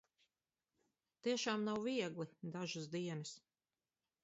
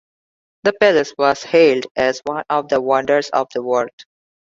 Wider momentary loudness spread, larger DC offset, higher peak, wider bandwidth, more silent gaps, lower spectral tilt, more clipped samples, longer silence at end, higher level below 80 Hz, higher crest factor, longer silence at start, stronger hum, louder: about the same, 10 LU vs 8 LU; neither; second, -26 dBFS vs 0 dBFS; about the same, 7.6 kHz vs 7.8 kHz; second, none vs 1.91-1.95 s, 3.93-3.98 s; about the same, -4 dB/octave vs -4.5 dB/octave; neither; first, 0.85 s vs 0.55 s; second, -84 dBFS vs -60 dBFS; about the same, 20 dB vs 16 dB; first, 1.25 s vs 0.65 s; neither; second, -43 LUFS vs -17 LUFS